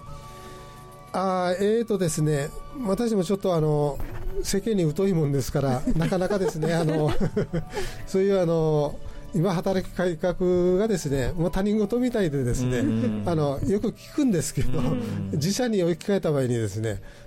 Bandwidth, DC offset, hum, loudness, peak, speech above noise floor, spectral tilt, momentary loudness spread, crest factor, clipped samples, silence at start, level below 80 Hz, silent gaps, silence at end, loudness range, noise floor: 16.5 kHz; under 0.1%; none; -25 LUFS; -14 dBFS; 20 dB; -6.5 dB/octave; 9 LU; 10 dB; under 0.1%; 0 s; -38 dBFS; none; 0 s; 1 LU; -44 dBFS